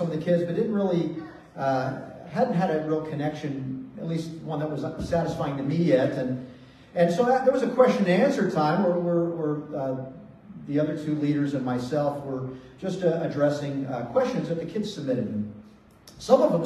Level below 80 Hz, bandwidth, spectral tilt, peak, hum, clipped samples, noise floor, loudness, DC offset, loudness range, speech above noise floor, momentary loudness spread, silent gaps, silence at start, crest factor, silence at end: -58 dBFS; 12.5 kHz; -7.5 dB/octave; -6 dBFS; none; under 0.1%; -51 dBFS; -26 LUFS; under 0.1%; 6 LU; 26 dB; 13 LU; none; 0 s; 20 dB; 0 s